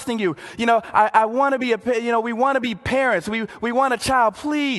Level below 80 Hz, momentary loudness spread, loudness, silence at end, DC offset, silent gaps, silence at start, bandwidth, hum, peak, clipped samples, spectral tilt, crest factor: -50 dBFS; 6 LU; -20 LUFS; 0 s; under 0.1%; none; 0 s; 12.5 kHz; none; -2 dBFS; under 0.1%; -4.5 dB/octave; 18 dB